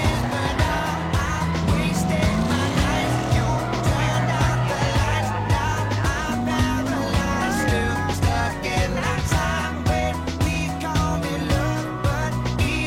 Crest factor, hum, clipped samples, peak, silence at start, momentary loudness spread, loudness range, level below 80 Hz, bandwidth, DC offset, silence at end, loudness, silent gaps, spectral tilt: 14 dB; none; under 0.1%; -8 dBFS; 0 s; 3 LU; 2 LU; -30 dBFS; 16.5 kHz; under 0.1%; 0 s; -22 LUFS; none; -5.5 dB/octave